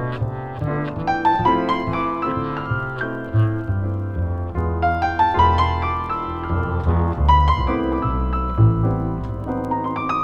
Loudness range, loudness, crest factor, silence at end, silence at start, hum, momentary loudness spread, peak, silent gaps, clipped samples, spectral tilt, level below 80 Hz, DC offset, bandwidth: 3 LU; -21 LUFS; 16 dB; 0 s; 0 s; none; 9 LU; -4 dBFS; none; under 0.1%; -8.5 dB/octave; -28 dBFS; under 0.1%; 6.8 kHz